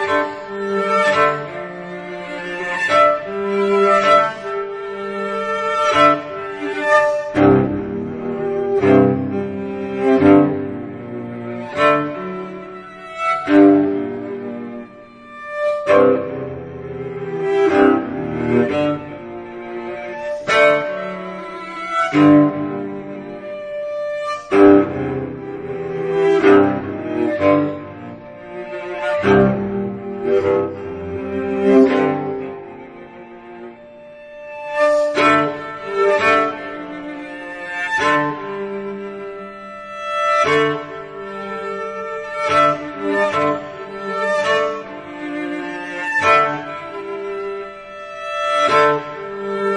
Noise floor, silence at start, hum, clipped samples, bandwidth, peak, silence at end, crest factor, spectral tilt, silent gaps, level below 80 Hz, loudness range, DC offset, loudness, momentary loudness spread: -39 dBFS; 0 s; none; under 0.1%; 10 kHz; 0 dBFS; 0 s; 18 dB; -6 dB/octave; none; -52 dBFS; 4 LU; under 0.1%; -17 LUFS; 18 LU